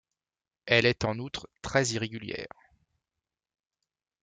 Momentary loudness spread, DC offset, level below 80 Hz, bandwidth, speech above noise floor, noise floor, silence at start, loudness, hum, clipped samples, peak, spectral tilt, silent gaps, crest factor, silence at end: 16 LU; under 0.1%; -58 dBFS; 9.6 kHz; over 61 dB; under -90 dBFS; 0.65 s; -28 LUFS; none; under 0.1%; -8 dBFS; -4 dB/octave; none; 24 dB; 1.75 s